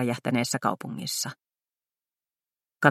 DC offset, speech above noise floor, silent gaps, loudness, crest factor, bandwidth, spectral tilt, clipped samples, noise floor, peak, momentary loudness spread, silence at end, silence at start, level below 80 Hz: under 0.1%; over 61 dB; none; -28 LUFS; 28 dB; 16 kHz; -4 dB/octave; under 0.1%; under -90 dBFS; -2 dBFS; 8 LU; 0 s; 0 s; -74 dBFS